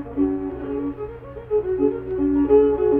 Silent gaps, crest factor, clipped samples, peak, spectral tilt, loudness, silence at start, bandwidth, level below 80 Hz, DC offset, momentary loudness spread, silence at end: none; 16 dB; under 0.1%; -4 dBFS; -11.5 dB/octave; -21 LUFS; 0 s; 3.4 kHz; -42 dBFS; under 0.1%; 15 LU; 0 s